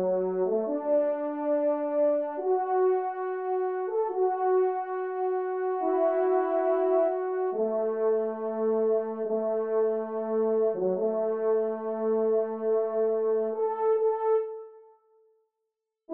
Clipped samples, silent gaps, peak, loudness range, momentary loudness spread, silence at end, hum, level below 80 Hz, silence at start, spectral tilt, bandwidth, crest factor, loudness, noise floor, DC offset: under 0.1%; none; -14 dBFS; 1 LU; 5 LU; 0 s; none; -84 dBFS; 0 s; -7.5 dB/octave; 3.2 kHz; 12 dB; -27 LUFS; -84 dBFS; under 0.1%